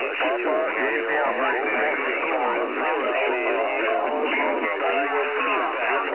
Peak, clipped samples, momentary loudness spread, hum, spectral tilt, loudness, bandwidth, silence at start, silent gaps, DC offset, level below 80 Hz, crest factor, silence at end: -12 dBFS; under 0.1%; 1 LU; none; -6 dB/octave; -23 LUFS; 4 kHz; 0 s; none; 0.1%; -76 dBFS; 12 dB; 0 s